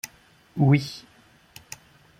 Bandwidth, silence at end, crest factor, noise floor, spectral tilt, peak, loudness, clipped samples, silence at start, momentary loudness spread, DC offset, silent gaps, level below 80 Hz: 16.5 kHz; 1.2 s; 20 dB; -56 dBFS; -6.5 dB/octave; -8 dBFS; -22 LUFS; under 0.1%; 0.05 s; 22 LU; under 0.1%; none; -62 dBFS